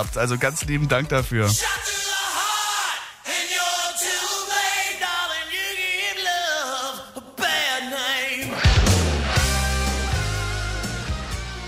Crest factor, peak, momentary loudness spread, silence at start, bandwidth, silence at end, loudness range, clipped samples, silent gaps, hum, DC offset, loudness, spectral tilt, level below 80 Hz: 18 dB; -6 dBFS; 7 LU; 0 s; 16 kHz; 0 s; 2 LU; under 0.1%; none; none; under 0.1%; -22 LUFS; -3 dB/octave; -32 dBFS